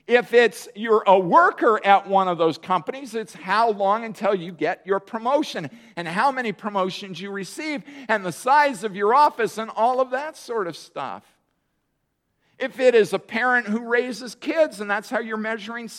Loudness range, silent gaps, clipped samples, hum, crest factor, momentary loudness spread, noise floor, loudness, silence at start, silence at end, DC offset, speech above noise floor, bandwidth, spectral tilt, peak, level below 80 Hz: 6 LU; none; under 0.1%; none; 22 dB; 14 LU; -74 dBFS; -22 LUFS; 0.1 s; 0 s; under 0.1%; 52 dB; 15 kHz; -4.5 dB/octave; -2 dBFS; -76 dBFS